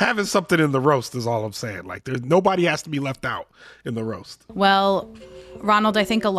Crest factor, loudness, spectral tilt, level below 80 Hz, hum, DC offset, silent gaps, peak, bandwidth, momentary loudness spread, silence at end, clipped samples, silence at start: 16 dB; -21 LUFS; -5 dB/octave; -56 dBFS; none; under 0.1%; none; -6 dBFS; 14.5 kHz; 15 LU; 0 s; under 0.1%; 0 s